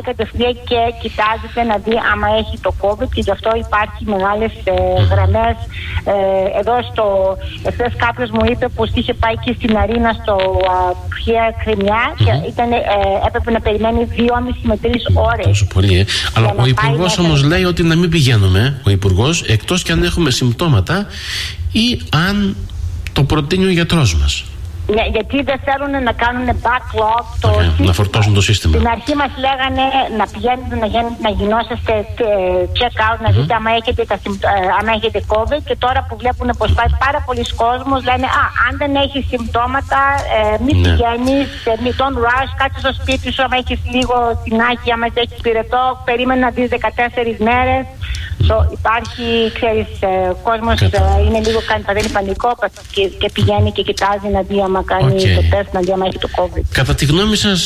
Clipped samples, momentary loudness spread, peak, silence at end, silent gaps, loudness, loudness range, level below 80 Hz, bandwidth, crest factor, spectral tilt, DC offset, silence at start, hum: under 0.1%; 5 LU; 0 dBFS; 0 s; none; -15 LUFS; 3 LU; -24 dBFS; 14.5 kHz; 14 dB; -5.5 dB/octave; under 0.1%; 0 s; none